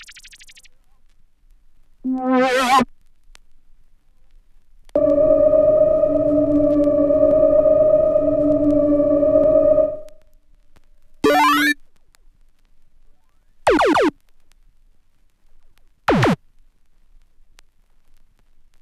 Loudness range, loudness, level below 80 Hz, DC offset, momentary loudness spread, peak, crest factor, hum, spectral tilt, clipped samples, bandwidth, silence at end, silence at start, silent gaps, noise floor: 10 LU; -16 LUFS; -42 dBFS; under 0.1%; 9 LU; -4 dBFS; 16 dB; none; -5.5 dB/octave; under 0.1%; 14.5 kHz; 2.45 s; 0 s; none; -53 dBFS